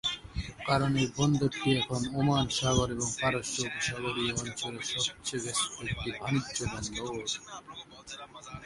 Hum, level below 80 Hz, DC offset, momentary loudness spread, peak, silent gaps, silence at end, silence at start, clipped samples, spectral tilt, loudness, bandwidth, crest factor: none; -50 dBFS; under 0.1%; 15 LU; -12 dBFS; none; 0 s; 0.05 s; under 0.1%; -4 dB/octave; -31 LUFS; 11.5 kHz; 20 dB